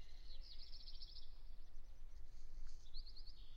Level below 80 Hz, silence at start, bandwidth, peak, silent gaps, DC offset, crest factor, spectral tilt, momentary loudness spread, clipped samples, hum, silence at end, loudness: -52 dBFS; 0 s; 6.6 kHz; -36 dBFS; none; under 0.1%; 10 dB; -3.5 dB/octave; 7 LU; under 0.1%; none; 0 s; -60 LUFS